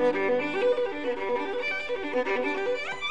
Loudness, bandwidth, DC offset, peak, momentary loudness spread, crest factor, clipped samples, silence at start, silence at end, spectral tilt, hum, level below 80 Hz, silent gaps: -28 LUFS; 9.2 kHz; 0.9%; -14 dBFS; 4 LU; 14 dB; under 0.1%; 0 s; 0 s; -4.5 dB/octave; none; -62 dBFS; none